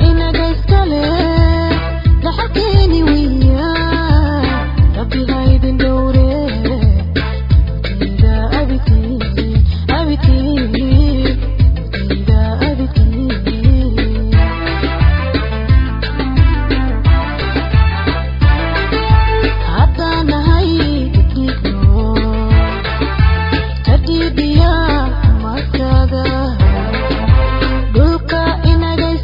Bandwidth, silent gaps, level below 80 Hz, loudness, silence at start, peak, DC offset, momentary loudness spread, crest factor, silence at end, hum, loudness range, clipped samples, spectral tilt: 5.4 kHz; none; -14 dBFS; -14 LUFS; 0 s; 0 dBFS; under 0.1%; 5 LU; 12 dB; 0 s; none; 1 LU; under 0.1%; -9 dB/octave